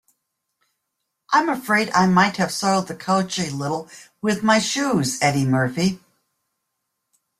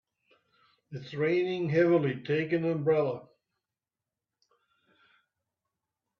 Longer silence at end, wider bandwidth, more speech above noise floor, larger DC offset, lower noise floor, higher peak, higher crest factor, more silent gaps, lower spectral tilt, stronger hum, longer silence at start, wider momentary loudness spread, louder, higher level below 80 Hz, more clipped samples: second, 1.4 s vs 2.95 s; first, 15.5 kHz vs 6.4 kHz; second, 58 dB vs over 62 dB; neither; second, -78 dBFS vs under -90 dBFS; first, -2 dBFS vs -14 dBFS; about the same, 20 dB vs 18 dB; neither; second, -4.5 dB/octave vs -8.5 dB/octave; neither; first, 1.3 s vs 0.9 s; second, 9 LU vs 16 LU; first, -20 LUFS vs -28 LUFS; first, -58 dBFS vs -74 dBFS; neither